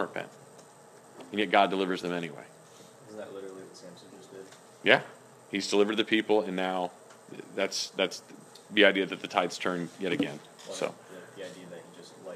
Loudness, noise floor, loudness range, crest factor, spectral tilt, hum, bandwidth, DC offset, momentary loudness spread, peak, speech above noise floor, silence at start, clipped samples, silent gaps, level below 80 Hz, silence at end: -28 LUFS; -54 dBFS; 4 LU; 28 dB; -3.5 dB/octave; none; 15 kHz; under 0.1%; 24 LU; -2 dBFS; 24 dB; 0 s; under 0.1%; none; -80 dBFS; 0 s